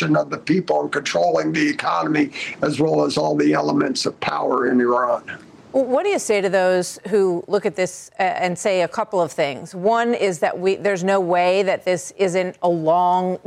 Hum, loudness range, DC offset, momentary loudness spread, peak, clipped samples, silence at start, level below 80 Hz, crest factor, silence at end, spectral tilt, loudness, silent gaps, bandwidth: none; 1 LU; under 0.1%; 6 LU; -8 dBFS; under 0.1%; 0 s; -64 dBFS; 12 dB; 0.1 s; -5 dB/octave; -20 LUFS; none; 14.5 kHz